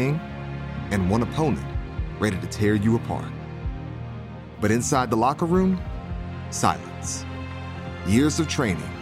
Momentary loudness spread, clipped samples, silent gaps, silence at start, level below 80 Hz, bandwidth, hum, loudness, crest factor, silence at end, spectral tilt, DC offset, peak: 13 LU; under 0.1%; none; 0 s; -38 dBFS; 15.5 kHz; none; -25 LUFS; 20 dB; 0 s; -5.5 dB/octave; under 0.1%; -6 dBFS